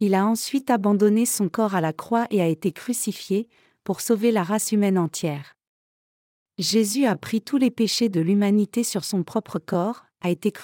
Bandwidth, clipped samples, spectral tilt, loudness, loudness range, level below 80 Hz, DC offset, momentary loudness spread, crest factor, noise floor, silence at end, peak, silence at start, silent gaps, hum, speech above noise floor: 17 kHz; under 0.1%; -5 dB/octave; -23 LUFS; 2 LU; -72 dBFS; under 0.1%; 9 LU; 16 dB; under -90 dBFS; 0 s; -8 dBFS; 0 s; 5.67-6.46 s; none; over 68 dB